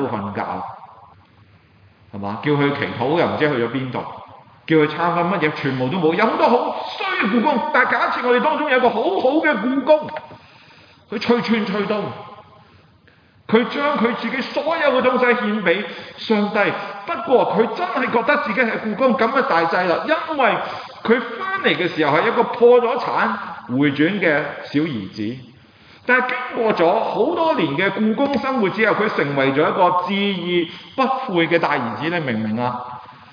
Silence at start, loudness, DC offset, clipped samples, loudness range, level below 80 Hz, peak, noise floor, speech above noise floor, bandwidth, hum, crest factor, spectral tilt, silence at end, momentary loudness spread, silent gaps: 0 s; -19 LUFS; under 0.1%; under 0.1%; 5 LU; -64 dBFS; -4 dBFS; -52 dBFS; 34 dB; 5.2 kHz; none; 16 dB; -7.5 dB/octave; 0.2 s; 10 LU; none